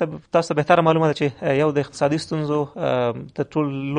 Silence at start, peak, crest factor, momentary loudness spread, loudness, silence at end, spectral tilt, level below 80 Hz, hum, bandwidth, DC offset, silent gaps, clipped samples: 0 s; -2 dBFS; 18 dB; 7 LU; -21 LUFS; 0 s; -6.5 dB/octave; -58 dBFS; none; 10 kHz; under 0.1%; none; under 0.1%